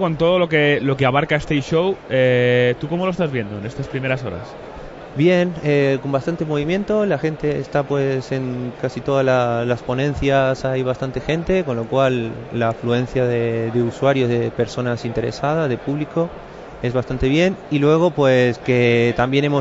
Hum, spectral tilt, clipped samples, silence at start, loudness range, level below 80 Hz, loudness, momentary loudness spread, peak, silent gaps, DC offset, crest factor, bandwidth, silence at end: none; -7 dB/octave; under 0.1%; 0 s; 3 LU; -42 dBFS; -19 LUFS; 9 LU; -4 dBFS; none; under 0.1%; 14 dB; 8 kHz; 0 s